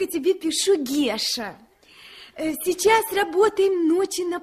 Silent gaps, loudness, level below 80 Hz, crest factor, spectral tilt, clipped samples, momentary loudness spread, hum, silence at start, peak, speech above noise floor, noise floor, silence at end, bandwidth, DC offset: none; -22 LUFS; -58 dBFS; 16 dB; -2 dB/octave; under 0.1%; 10 LU; none; 0 s; -6 dBFS; 27 dB; -48 dBFS; 0 s; 15.5 kHz; under 0.1%